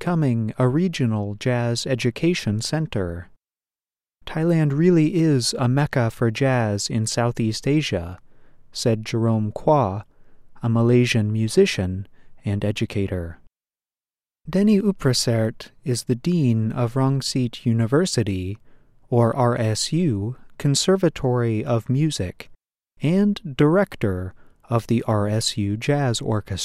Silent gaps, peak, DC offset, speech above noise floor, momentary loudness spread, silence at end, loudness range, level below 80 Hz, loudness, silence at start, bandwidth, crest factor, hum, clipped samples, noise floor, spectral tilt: none; -6 dBFS; under 0.1%; over 69 dB; 10 LU; 0 s; 3 LU; -50 dBFS; -22 LUFS; 0 s; 14 kHz; 16 dB; none; under 0.1%; under -90 dBFS; -6 dB/octave